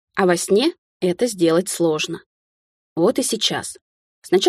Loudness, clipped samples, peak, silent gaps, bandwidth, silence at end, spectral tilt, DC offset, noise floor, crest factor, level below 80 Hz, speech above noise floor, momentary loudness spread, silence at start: -20 LUFS; under 0.1%; -2 dBFS; 0.78-1.00 s, 2.26-2.96 s, 3.81-4.22 s; 15.5 kHz; 0 s; -4 dB/octave; under 0.1%; under -90 dBFS; 18 dB; -64 dBFS; over 71 dB; 10 LU; 0.15 s